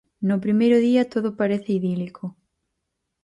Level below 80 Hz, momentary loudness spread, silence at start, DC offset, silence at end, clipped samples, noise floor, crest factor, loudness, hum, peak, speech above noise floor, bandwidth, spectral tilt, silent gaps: -66 dBFS; 14 LU; 0.2 s; under 0.1%; 0.95 s; under 0.1%; -79 dBFS; 14 dB; -21 LUFS; none; -8 dBFS; 58 dB; 10.5 kHz; -8 dB/octave; none